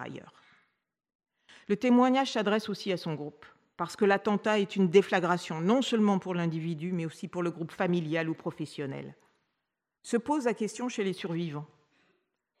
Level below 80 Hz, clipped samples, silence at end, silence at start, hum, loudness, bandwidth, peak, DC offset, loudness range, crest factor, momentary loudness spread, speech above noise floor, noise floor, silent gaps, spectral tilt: -78 dBFS; under 0.1%; 0.95 s; 0 s; none; -29 LUFS; 13 kHz; -10 dBFS; under 0.1%; 7 LU; 20 dB; 14 LU; 56 dB; -85 dBFS; 1.15-1.19 s; -6 dB/octave